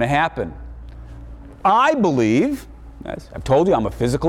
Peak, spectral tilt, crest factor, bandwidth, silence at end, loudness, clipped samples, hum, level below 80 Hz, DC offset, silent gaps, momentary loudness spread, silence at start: -6 dBFS; -6.5 dB/octave; 14 dB; 15.5 kHz; 0 s; -18 LUFS; under 0.1%; none; -38 dBFS; under 0.1%; none; 23 LU; 0 s